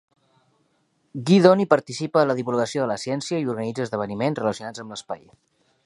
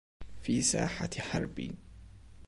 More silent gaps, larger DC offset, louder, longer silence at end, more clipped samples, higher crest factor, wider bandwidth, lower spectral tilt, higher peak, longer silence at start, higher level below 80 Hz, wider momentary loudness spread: neither; neither; first, -22 LUFS vs -33 LUFS; first, 0.7 s vs 0 s; neither; about the same, 22 dB vs 20 dB; about the same, 11.5 kHz vs 11.5 kHz; first, -6 dB/octave vs -4 dB/octave; first, 0 dBFS vs -16 dBFS; first, 1.15 s vs 0.2 s; second, -66 dBFS vs -52 dBFS; first, 18 LU vs 14 LU